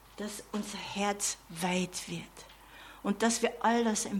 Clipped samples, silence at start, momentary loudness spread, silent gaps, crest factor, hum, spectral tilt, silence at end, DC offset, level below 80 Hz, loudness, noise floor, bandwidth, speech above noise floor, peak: under 0.1%; 0.05 s; 21 LU; none; 20 dB; none; -3.5 dB/octave; 0 s; under 0.1%; -62 dBFS; -32 LUFS; -52 dBFS; 17.5 kHz; 20 dB; -14 dBFS